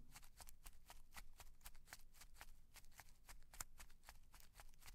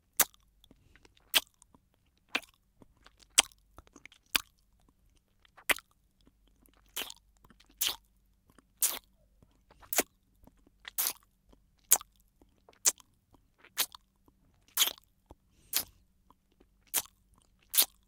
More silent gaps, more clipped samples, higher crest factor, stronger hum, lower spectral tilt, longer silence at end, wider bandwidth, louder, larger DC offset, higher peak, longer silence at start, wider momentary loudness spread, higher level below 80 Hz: neither; neither; second, 28 dB vs 36 dB; neither; first, -1.5 dB/octave vs 1.5 dB/octave; second, 0 s vs 0.25 s; second, 16 kHz vs 18 kHz; second, -63 LUFS vs -31 LUFS; neither; second, -30 dBFS vs 0 dBFS; second, 0 s vs 0.2 s; second, 10 LU vs 17 LU; about the same, -64 dBFS vs -68 dBFS